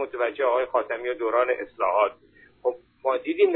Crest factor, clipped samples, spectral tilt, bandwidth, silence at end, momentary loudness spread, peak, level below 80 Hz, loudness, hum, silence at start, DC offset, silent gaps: 16 dB; under 0.1%; -7.5 dB/octave; 4.1 kHz; 0 s; 7 LU; -8 dBFS; -66 dBFS; -25 LUFS; none; 0 s; under 0.1%; none